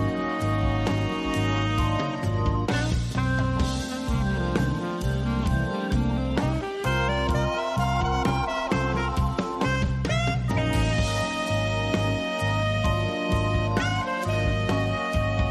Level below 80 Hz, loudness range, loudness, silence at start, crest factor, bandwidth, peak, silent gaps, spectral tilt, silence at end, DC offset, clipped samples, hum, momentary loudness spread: -32 dBFS; 1 LU; -25 LUFS; 0 s; 14 dB; 13 kHz; -12 dBFS; none; -6 dB/octave; 0 s; under 0.1%; under 0.1%; none; 2 LU